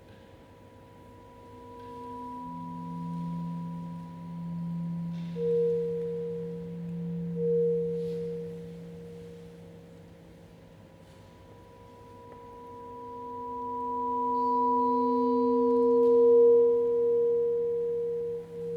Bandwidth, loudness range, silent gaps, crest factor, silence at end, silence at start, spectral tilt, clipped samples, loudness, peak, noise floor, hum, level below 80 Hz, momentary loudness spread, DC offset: 4.8 kHz; 21 LU; none; 16 dB; 0 s; 0.05 s; -10 dB/octave; under 0.1%; -28 LUFS; -14 dBFS; -52 dBFS; none; -64 dBFS; 23 LU; under 0.1%